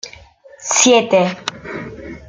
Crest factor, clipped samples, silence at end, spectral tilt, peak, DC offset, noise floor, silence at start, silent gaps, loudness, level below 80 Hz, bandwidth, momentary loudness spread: 18 dB; under 0.1%; 0.1 s; -2.5 dB/octave; 0 dBFS; under 0.1%; -42 dBFS; 0.05 s; none; -14 LUFS; -50 dBFS; 10 kHz; 20 LU